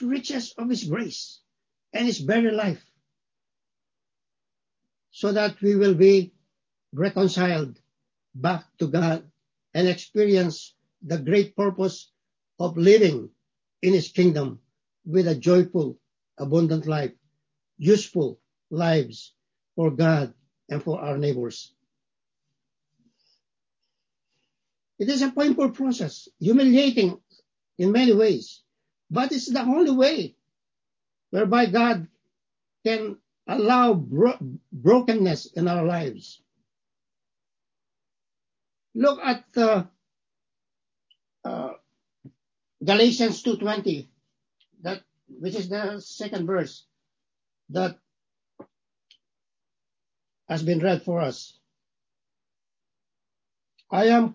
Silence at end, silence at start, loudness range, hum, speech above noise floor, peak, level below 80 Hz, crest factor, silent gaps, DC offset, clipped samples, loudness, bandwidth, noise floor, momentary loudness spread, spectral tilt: 0 s; 0 s; 10 LU; none; over 68 dB; -4 dBFS; -72 dBFS; 20 dB; none; under 0.1%; under 0.1%; -23 LUFS; 7.6 kHz; under -90 dBFS; 16 LU; -6.5 dB/octave